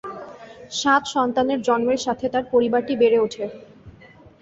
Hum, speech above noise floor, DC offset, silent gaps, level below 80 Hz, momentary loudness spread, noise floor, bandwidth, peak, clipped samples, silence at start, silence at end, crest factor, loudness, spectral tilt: none; 28 dB; under 0.1%; none; -58 dBFS; 16 LU; -48 dBFS; 8 kHz; -6 dBFS; under 0.1%; 0.05 s; 0.5 s; 16 dB; -21 LUFS; -4 dB/octave